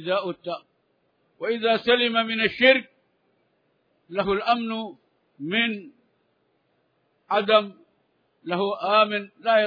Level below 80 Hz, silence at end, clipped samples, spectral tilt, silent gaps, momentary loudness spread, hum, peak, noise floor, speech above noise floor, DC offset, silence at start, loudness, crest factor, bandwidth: -64 dBFS; 0 s; under 0.1%; -6.5 dB/octave; none; 16 LU; none; -4 dBFS; -69 dBFS; 46 dB; under 0.1%; 0 s; -23 LUFS; 22 dB; 5.2 kHz